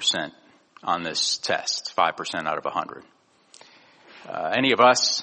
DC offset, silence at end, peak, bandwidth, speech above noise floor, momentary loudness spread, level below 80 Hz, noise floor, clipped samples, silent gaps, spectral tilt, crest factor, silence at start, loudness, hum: under 0.1%; 0 s; -2 dBFS; 8.8 kHz; 30 dB; 16 LU; -70 dBFS; -54 dBFS; under 0.1%; none; -1.5 dB/octave; 24 dB; 0 s; -23 LUFS; none